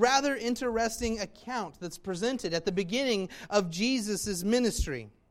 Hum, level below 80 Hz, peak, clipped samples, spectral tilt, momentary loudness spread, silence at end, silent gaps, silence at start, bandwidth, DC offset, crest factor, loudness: none; -46 dBFS; -10 dBFS; under 0.1%; -4 dB/octave; 9 LU; 0.2 s; none; 0 s; 16 kHz; under 0.1%; 20 dB; -30 LUFS